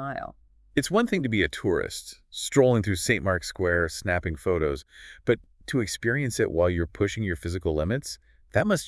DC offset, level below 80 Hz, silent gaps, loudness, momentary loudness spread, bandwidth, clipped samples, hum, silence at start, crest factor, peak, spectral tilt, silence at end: under 0.1%; -46 dBFS; none; -26 LUFS; 10 LU; 12 kHz; under 0.1%; none; 0 s; 18 dB; -8 dBFS; -5 dB/octave; 0 s